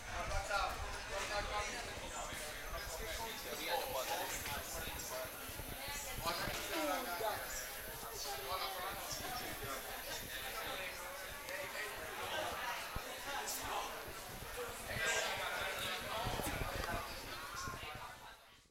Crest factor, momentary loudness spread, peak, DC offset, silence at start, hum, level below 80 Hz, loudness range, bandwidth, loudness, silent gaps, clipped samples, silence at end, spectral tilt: 18 dB; 7 LU; -26 dBFS; under 0.1%; 0 s; none; -54 dBFS; 3 LU; 16 kHz; -42 LUFS; none; under 0.1%; 0.1 s; -2 dB/octave